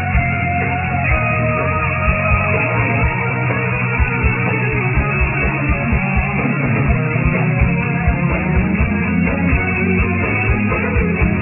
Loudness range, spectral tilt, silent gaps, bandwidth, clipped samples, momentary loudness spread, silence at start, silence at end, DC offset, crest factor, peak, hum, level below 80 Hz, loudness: 0 LU; -11.5 dB/octave; none; 3 kHz; under 0.1%; 2 LU; 0 s; 0 s; under 0.1%; 14 dB; -2 dBFS; none; -24 dBFS; -16 LUFS